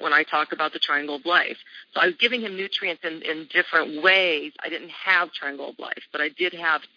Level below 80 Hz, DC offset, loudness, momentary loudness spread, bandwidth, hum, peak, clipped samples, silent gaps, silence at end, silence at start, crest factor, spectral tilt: under -90 dBFS; under 0.1%; -23 LUFS; 13 LU; 5.4 kHz; none; -6 dBFS; under 0.1%; none; 0.1 s; 0 s; 20 dB; -3.5 dB/octave